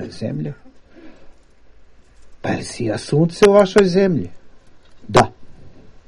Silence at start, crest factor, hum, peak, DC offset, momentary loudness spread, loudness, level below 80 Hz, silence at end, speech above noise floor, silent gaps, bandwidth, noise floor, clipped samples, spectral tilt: 0 s; 20 dB; none; 0 dBFS; under 0.1%; 15 LU; -17 LUFS; -44 dBFS; 0.15 s; 29 dB; none; 11.5 kHz; -45 dBFS; under 0.1%; -6 dB/octave